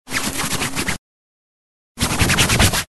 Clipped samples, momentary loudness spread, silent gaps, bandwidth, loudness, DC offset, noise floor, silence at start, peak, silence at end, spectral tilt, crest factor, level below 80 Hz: under 0.1%; 10 LU; 0.98-1.95 s; 12.5 kHz; -18 LUFS; under 0.1%; under -90 dBFS; 0.05 s; -2 dBFS; 0.05 s; -3 dB/octave; 20 dB; -32 dBFS